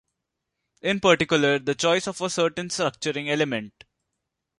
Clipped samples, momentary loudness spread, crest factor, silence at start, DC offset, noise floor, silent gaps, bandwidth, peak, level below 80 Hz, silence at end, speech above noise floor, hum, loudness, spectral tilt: under 0.1%; 9 LU; 22 dB; 0.85 s; under 0.1%; -82 dBFS; none; 11.5 kHz; -4 dBFS; -62 dBFS; 0.9 s; 58 dB; none; -23 LUFS; -4 dB/octave